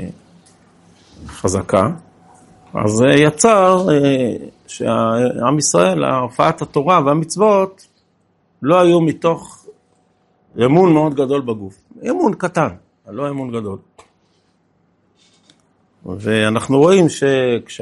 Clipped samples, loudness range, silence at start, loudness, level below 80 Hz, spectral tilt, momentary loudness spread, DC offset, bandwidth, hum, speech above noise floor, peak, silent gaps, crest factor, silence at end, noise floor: under 0.1%; 9 LU; 0 s; -15 LUFS; -54 dBFS; -5.5 dB/octave; 16 LU; under 0.1%; 11.5 kHz; none; 46 dB; 0 dBFS; none; 16 dB; 0.05 s; -60 dBFS